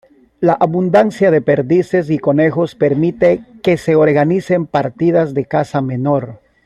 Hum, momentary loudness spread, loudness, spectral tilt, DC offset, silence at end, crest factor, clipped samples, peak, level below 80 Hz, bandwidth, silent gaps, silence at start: none; 6 LU; -14 LUFS; -8 dB/octave; under 0.1%; 0.3 s; 14 dB; under 0.1%; 0 dBFS; -50 dBFS; 11.5 kHz; none; 0.4 s